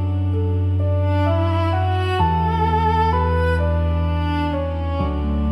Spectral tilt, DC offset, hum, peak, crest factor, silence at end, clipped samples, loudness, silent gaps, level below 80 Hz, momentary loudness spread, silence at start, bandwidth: -8.5 dB/octave; under 0.1%; none; -6 dBFS; 12 dB; 0 s; under 0.1%; -20 LUFS; none; -30 dBFS; 4 LU; 0 s; 5.6 kHz